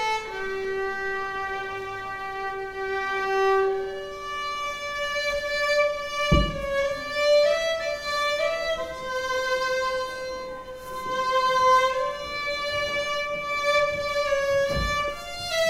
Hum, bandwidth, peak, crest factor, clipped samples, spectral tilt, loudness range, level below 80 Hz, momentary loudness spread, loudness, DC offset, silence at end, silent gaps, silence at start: none; 16 kHz; -6 dBFS; 20 dB; under 0.1%; -3.5 dB/octave; 4 LU; -42 dBFS; 11 LU; -25 LUFS; under 0.1%; 0 s; none; 0 s